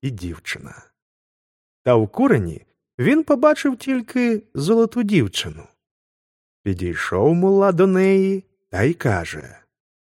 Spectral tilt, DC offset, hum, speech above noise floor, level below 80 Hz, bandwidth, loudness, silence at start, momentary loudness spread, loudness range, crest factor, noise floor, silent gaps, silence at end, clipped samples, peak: -6.5 dB/octave; under 0.1%; none; over 72 dB; -50 dBFS; 15.5 kHz; -19 LUFS; 0.05 s; 15 LU; 3 LU; 18 dB; under -90 dBFS; 1.02-1.85 s, 2.94-2.98 s, 5.91-6.64 s; 0.7 s; under 0.1%; -2 dBFS